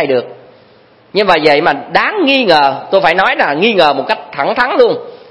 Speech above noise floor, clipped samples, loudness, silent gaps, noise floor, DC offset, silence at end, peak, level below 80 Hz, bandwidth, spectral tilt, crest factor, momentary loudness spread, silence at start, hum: 34 dB; 0.3%; -11 LUFS; none; -45 dBFS; under 0.1%; 0.15 s; 0 dBFS; -50 dBFS; 11 kHz; -5.5 dB/octave; 12 dB; 8 LU; 0 s; none